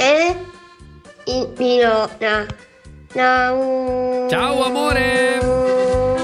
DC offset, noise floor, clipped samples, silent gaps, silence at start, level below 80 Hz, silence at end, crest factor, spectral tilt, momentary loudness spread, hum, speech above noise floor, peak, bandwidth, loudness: under 0.1%; -42 dBFS; under 0.1%; none; 0 s; -38 dBFS; 0 s; 14 dB; -4.5 dB/octave; 12 LU; none; 25 dB; -4 dBFS; 13 kHz; -17 LUFS